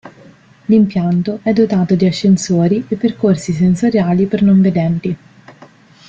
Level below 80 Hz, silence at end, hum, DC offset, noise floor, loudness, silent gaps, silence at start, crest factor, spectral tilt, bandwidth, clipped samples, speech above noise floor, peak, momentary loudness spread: -50 dBFS; 0.55 s; none; under 0.1%; -43 dBFS; -14 LUFS; none; 0.05 s; 12 dB; -7.5 dB/octave; 8.2 kHz; under 0.1%; 30 dB; -2 dBFS; 6 LU